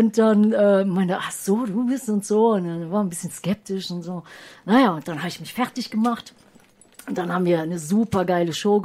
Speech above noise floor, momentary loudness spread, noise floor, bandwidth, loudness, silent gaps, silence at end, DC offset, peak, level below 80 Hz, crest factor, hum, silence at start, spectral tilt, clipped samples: 32 dB; 13 LU; -53 dBFS; 15.5 kHz; -22 LUFS; none; 0 s; under 0.1%; -6 dBFS; -62 dBFS; 14 dB; none; 0 s; -6 dB/octave; under 0.1%